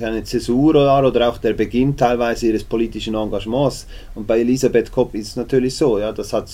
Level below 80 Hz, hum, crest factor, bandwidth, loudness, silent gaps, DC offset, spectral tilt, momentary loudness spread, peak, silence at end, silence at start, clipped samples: -36 dBFS; none; 16 dB; 16 kHz; -18 LUFS; none; under 0.1%; -6 dB/octave; 8 LU; -2 dBFS; 0 s; 0 s; under 0.1%